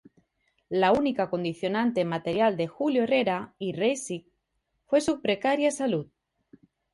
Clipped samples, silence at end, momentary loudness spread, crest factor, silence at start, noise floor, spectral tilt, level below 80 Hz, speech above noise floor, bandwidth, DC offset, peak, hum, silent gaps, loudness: under 0.1%; 0.9 s; 9 LU; 18 dB; 0.7 s; -77 dBFS; -5 dB/octave; -64 dBFS; 52 dB; 11.5 kHz; under 0.1%; -10 dBFS; none; none; -27 LUFS